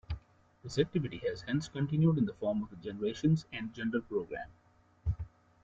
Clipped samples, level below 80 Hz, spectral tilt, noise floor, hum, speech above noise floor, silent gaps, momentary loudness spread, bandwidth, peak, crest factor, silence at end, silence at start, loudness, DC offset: under 0.1%; -52 dBFS; -7.5 dB/octave; -54 dBFS; none; 21 dB; none; 15 LU; 7.8 kHz; -16 dBFS; 18 dB; 0.35 s; 0.1 s; -34 LUFS; under 0.1%